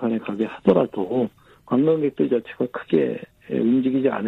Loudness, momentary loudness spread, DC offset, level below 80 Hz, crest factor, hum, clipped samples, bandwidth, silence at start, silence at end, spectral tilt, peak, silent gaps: -22 LUFS; 9 LU; under 0.1%; -60 dBFS; 18 dB; none; under 0.1%; 4.2 kHz; 0 s; 0 s; -9.5 dB/octave; -4 dBFS; none